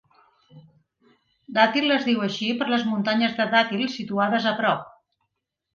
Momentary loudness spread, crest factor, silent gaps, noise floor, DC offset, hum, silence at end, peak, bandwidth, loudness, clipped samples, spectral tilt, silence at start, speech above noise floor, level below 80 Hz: 6 LU; 20 dB; none; -79 dBFS; under 0.1%; none; 0.85 s; -4 dBFS; 7.2 kHz; -23 LUFS; under 0.1%; -5.5 dB/octave; 0.55 s; 57 dB; -70 dBFS